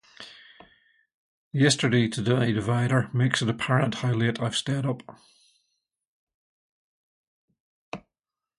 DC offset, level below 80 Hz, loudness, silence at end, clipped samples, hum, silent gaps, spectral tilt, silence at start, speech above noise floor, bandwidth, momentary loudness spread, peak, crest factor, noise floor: under 0.1%; -60 dBFS; -25 LUFS; 0.6 s; under 0.1%; none; 1.14-1.51 s, 6.07-6.27 s, 6.34-7.48 s, 7.60-7.92 s; -5.5 dB/octave; 0.2 s; over 66 dB; 11.5 kHz; 20 LU; -6 dBFS; 22 dB; under -90 dBFS